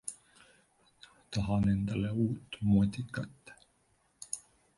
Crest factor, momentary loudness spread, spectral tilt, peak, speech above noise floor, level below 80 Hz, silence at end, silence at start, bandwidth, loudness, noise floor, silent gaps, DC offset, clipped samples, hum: 18 dB; 16 LU; -6.5 dB/octave; -16 dBFS; 41 dB; -54 dBFS; 0.4 s; 0.05 s; 11.5 kHz; -33 LUFS; -72 dBFS; none; under 0.1%; under 0.1%; none